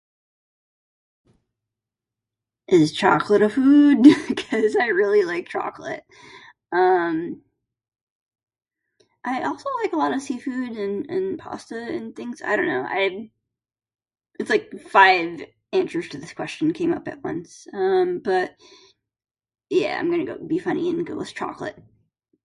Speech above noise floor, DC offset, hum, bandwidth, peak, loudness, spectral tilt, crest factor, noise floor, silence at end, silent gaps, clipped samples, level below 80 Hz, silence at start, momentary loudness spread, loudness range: 66 dB; under 0.1%; none; 11.5 kHz; 0 dBFS; -21 LUFS; -5.5 dB/octave; 22 dB; -87 dBFS; 0.65 s; 8.01-8.26 s, 8.43-8.47 s; under 0.1%; -66 dBFS; 2.7 s; 18 LU; 9 LU